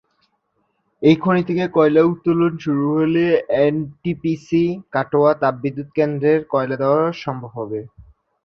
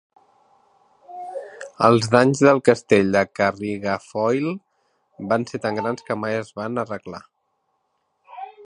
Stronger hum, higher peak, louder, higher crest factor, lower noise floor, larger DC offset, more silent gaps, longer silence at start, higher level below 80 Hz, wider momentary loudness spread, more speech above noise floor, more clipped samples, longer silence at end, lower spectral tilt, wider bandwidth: neither; about the same, -2 dBFS vs 0 dBFS; about the same, -18 LUFS vs -20 LUFS; second, 16 dB vs 22 dB; second, -68 dBFS vs -72 dBFS; neither; neither; about the same, 1 s vs 1.1 s; about the same, -56 dBFS vs -58 dBFS; second, 11 LU vs 21 LU; about the same, 51 dB vs 52 dB; neither; first, 0.55 s vs 0 s; first, -8.5 dB/octave vs -6 dB/octave; second, 6.6 kHz vs 11 kHz